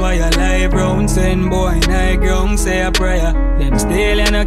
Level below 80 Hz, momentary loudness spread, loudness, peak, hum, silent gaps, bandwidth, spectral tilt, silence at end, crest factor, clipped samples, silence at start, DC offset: -16 dBFS; 2 LU; -15 LUFS; -2 dBFS; none; none; 14 kHz; -5 dB/octave; 0 s; 10 dB; under 0.1%; 0 s; under 0.1%